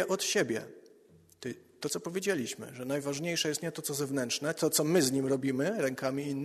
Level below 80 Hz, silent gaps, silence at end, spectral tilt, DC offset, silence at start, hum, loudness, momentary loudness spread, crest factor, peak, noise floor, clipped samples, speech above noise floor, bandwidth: -72 dBFS; none; 0 s; -3.5 dB/octave; under 0.1%; 0 s; none; -31 LUFS; 13 LU; 18 dB; -14 dBFS; -61 dBFS; under 0.1%; 29 dB; 13.5 kHz